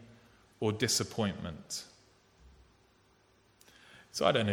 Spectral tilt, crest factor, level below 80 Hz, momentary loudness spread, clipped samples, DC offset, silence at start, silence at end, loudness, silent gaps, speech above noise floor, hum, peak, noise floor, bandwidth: -3.5 dB/octave; 24 dB; -64 dBFS; 23 LU; under 0.1%; under 0.1%; 0 s; 0 s; -33 LUFS; none; 35 dB; none; -12 dBFS; -67 dBFS; 17.5 kHz